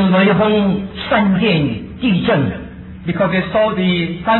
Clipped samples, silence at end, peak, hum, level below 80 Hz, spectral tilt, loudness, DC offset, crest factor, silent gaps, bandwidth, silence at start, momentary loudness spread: under 0.1%; 0 s; -2 dBFS; none; -40 dBFS; -10.5 dB/octave; -15 LUFS; under 0.1%; 12 dB; none; 4.3 kHz; 0 s; 10 LU